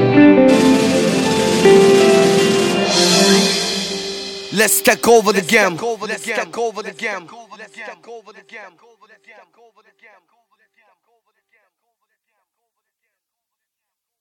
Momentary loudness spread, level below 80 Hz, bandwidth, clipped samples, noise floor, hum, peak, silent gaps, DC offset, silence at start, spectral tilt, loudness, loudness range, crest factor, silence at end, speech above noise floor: 15 LU; -56 dBFS; 17.5 kHz; under 0.1%; -80 dBFS; none; 0 dBFS; none; under 0.1%; 0 s; -3.5 dB/octave; -14 LUFS; 16 LU; 16 dB; 5.55 s; 62 dB